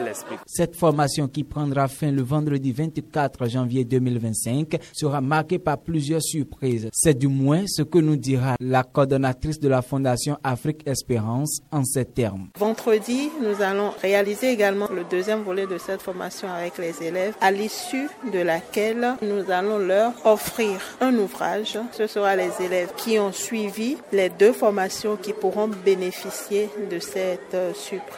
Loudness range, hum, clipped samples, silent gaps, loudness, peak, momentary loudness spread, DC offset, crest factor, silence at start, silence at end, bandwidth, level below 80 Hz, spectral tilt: 3 LU; none; under 0.1%; none; -23 LUFS; -4 dBFS; 7 LU; under 0.1%; 20 dB; 0 s; 0 s; 16.5 kHz; -52 dBFS; -5.5 dB/octave